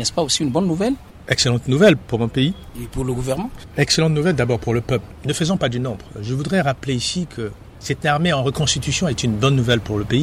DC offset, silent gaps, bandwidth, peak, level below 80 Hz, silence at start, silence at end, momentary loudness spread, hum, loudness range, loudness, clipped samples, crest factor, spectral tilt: under 0.1%; none; 15 kHz; -2 dBFS; -40 dBFS; 0 s; 0 s; 11 LU; none; 3 LU; -19 LUFS; under 0.1%; 16 dB; -5 dB/octave